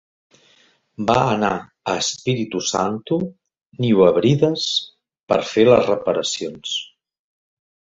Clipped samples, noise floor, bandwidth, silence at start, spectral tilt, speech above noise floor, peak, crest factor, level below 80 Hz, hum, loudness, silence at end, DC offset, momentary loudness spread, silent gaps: under 0.1%; -57 dBFS; 8 kHz; 1 s; -5 dB/octave; 39 dB; 0 dBFS; 20 dB; -54 dBFS; none; -19 LUFS; 1.1 s; under 0.1%; 11 LU; 3.66-3.70 s, 5.20-5.27 s